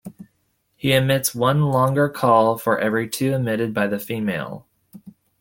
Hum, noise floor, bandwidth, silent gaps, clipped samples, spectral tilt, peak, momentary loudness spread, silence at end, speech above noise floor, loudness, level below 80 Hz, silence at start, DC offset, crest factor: none; -68 dBFS; 17 kHz; none; under 0.1%; -5.5 dB/octave; -2 dBFS; 10 LU; 0.3 s; 49 dB; -20 LUFS; -58 dBFS; 0.05 s; under 0.1%; 18 dB